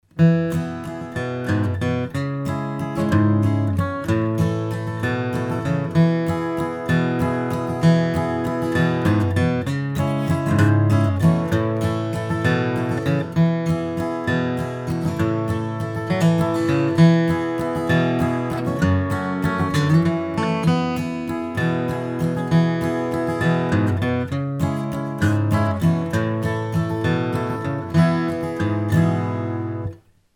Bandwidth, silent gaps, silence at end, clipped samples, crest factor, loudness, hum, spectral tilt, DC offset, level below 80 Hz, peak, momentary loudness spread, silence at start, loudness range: 14 kHz; none; 0.4 s; under 0.1%; 18 dB; -21 LUFS; none; -7.5 dB/octave; under 0.1%; -46 dBFS; -2 dBFS; 8 LU; 0.15 s; 3 LU